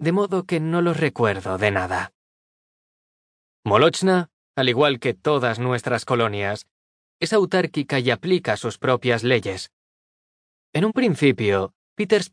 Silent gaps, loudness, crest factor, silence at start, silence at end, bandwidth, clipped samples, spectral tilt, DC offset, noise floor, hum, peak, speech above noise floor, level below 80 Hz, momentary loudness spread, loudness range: 2.15-3.63 s, 4.33-4.54 s, 6.71-7.20 s, 9.73-10.73 s, 11.75-11.96 s; -21 LUFS; 20 dB; 0 s; 0.05 s; 10.5 kHz; under 0.1%; -5.5 dB/octave; under 0.1%; under -90 dBFS; none; -2 dBFS; over 69 dB; -62 dBFS; 10 LU; 3 LU